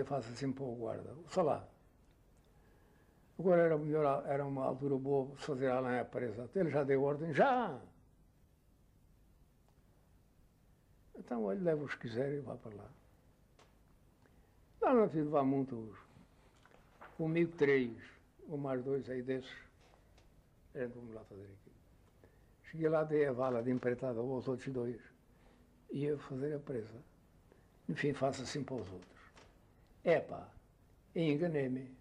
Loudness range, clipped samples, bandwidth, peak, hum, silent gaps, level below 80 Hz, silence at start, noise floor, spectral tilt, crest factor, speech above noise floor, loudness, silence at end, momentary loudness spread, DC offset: 8 LU; under 0.1%; 10.5 kHz; -20 dBFS; none; none; -68 dBFS; 0 s; -68 dBFS; -7.5 dB/octave; 18 dB; 32 dB; -37 LUFS; 0.05 s; 20 LU; under 0.1%